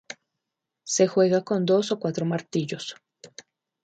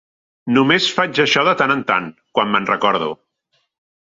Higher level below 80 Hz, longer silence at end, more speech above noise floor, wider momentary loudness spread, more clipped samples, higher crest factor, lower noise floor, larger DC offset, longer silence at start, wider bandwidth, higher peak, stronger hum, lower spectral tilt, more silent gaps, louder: second, -72 dBFS vs -60 dBFS; second, 0.6 s vs 1 s; first, 61 dB vs 51 dB; first, 22 LU vs 9 LU; neither; about the same, 18 dB vs 18 dB; first, -84 dBFS vs -67 dBFS; neither; second, 0.1 s vs 0.45 s; first, 9.4 kHz vs 7.8 kHz; second, -8 dBFS vs -2 dBFS; neither; about the same, -5 dB/octave vs -4.5 dB/octave; neither; second, -24 LUFS vs -16 LUFS